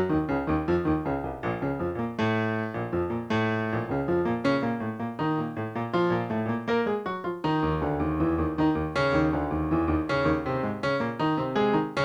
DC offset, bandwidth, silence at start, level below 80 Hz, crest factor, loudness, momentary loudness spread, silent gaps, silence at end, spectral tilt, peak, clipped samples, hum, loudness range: under 0.1%; 10 kHz; 0 s; -44 dBFS; 14 dB; -27 LUFS; 5 LU; none; 0 s; -8 dB/octave; -12 dBFS; under 0.1%; none; 2 LU